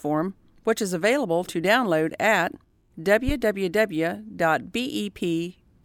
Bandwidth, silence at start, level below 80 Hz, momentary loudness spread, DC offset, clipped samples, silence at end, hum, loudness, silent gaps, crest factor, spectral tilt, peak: 17.5 kHz; 0.05 s; -44 dBFS; 8 LU; under 0.1%; under 0.1%; 0.35 s; none; -24 LUFS; none; 16 dB; -5 dB/octave; -8 dBFS